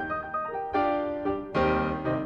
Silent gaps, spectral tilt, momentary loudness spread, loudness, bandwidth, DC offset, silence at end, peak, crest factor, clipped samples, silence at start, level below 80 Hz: none; -8 dB/octave; 5 LU; -28 LUFS; 7.2 kHz; under 0.1%; 0 s; -14 dBFS; 14 dB; under 0.1%; 0 s; -46 dBFS